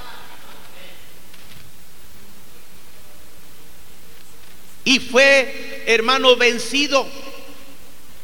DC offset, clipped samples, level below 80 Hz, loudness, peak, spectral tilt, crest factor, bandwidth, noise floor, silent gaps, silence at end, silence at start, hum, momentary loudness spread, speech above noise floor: 4%; under 0.1%; -56 dBFS; -15 LUFS; 0 dBFS; -1.5 dB/octave; 22 dB; 19 kHz; -46 dBFS; none; 0.75 s; 0 s; none; 27 LU; 30 dB